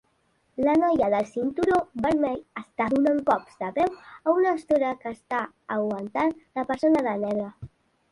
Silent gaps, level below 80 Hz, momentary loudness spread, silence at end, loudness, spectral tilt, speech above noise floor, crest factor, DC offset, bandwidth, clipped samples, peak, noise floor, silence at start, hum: none; -58 dBFS; 9 LU; 0.45 s; -25 LUFS; -7 dB/octave; 44 dB; 16 dB; under 0.1%; 11.5 kHz; under 0.1%; -8 dBFS; -68 dBFS; 0.6 s; none